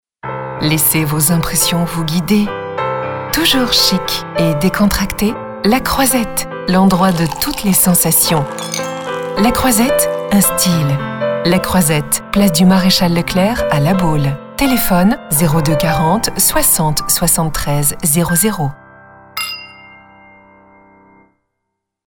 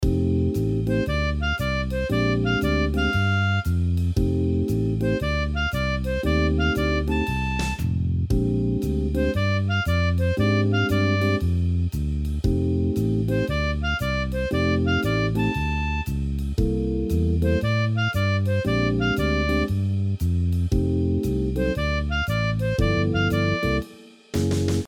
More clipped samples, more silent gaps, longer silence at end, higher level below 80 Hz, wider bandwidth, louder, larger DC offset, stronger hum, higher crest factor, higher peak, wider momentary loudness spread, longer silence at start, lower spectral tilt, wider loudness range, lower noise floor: neither; neither; first, 2.2 s vs 0 s; about the same, -32 dBFS vs -30 dBFS; first, over 20 kHz vs 16.5 kHz; first, -13 LUFS vs -23 LUFS; neither; neither; about the same, 14 dB vs 14 dB; first, 0 dBFS vs -8 dBFS; first, 10 LU vs 4 LU; first, 0.25 s vs 0 s; second, -4 dB/octave vs -7 dB/octave; about the same, 3 LU vs 1 LU; first, -75 dBFS vs -45 dBFS